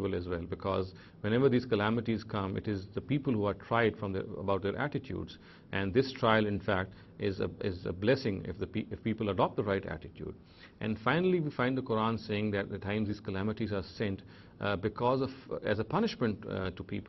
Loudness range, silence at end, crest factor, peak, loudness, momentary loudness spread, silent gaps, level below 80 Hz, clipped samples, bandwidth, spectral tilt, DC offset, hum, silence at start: 2 LU; 0 s; 22 dB; -12 dBFS; -33 LUFS; 9 LU; none; -58 dBFS; under 0.1%; 6 kHz; -8 dB/octave; under 0.1%; none; 0 s